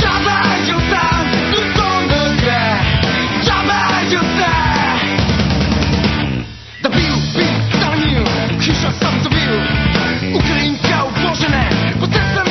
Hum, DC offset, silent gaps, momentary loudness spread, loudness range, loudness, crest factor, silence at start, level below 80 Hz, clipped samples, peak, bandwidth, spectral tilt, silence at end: none; 0.3%; none; 2 LU; 2 LU; -14 LUFS; 14 dB; 0 s; -26 dBFS; under 0.1%; 0 dBFS; 6.4 kHz; -5 dB/octave; 0 s